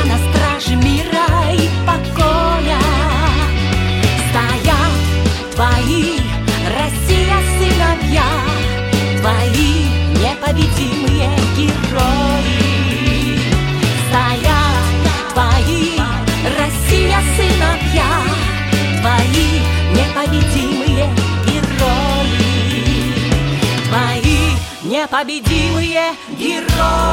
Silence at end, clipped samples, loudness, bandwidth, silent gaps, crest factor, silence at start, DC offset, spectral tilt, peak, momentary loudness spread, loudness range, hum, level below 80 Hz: 0 s; under 0.1%; -14 LUFS; 17 kHz; none; 12 dB; 0 s; under 0.1%; -5 dB/octave; 0 dBFS; 3 LU; 1 LU; none; -20 dBFS